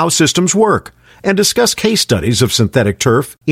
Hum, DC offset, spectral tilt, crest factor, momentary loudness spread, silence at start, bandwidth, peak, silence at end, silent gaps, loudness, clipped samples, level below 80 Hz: none; under 0.1%; -4 dB/octave; 12 dB; 4 LU; 0 s; 16.5 kHz; 0 dBFS; 0 s; none; -13 LUFS; under 0.1%; -40 dBFS